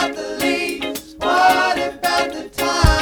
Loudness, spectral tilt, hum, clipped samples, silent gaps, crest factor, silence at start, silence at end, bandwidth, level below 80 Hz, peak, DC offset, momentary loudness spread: -18 LUFS; -4 dB/octave; none; under 0.1%; none; 14 dB; 0 s; 0 s; 19 kHz; -28 dBFS; -4 dBFS; under 0.1%; 10 LU